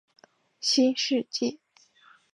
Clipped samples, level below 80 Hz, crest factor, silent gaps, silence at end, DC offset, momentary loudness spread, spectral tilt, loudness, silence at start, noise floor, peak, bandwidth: under 0.1%; -84 dBFS; 18 dB; none; 0.8 s; under 0.1%; 8 LU; -2 dB/octave; -26 LUFS; 0.6 s; -60 dBFS; -12 dBFS; 11 kHz